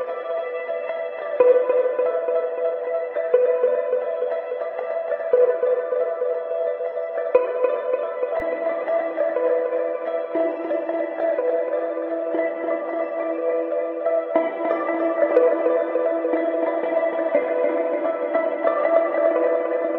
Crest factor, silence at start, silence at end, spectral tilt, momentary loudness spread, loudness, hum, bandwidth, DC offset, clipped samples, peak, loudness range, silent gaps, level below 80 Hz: 18 dB; 0 s; 0 s; -7.5 dB/octave; 7 LU; -22 LUFS; none; 4.2 kHz; under 0.1%; under 0.1%; -4 dBFS; 3 LU; none; -66 dBFS